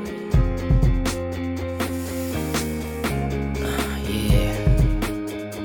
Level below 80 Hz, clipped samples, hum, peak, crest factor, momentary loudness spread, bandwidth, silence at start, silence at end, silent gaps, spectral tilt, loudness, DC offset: -26 dBFS; under 0.1%; none; -6 dBFS; 16 dB; 7 LU; 19 kHz; 0 s; 0 s; none; -6 dB/octave; -24 LUFS; under 0.1%